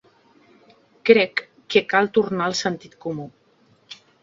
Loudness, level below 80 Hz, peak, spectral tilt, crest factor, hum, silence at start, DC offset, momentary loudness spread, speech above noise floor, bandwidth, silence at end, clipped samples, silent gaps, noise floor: -21 LUFS; -66 dBFS; 0 dBFS; -4.5 dB/octave; 22 dB; none; 1.05 s; under 0.1%; 24 LU; 38 dB; 7.6 kHz; 0.3 s; under 0.1%; none; -59 dBFS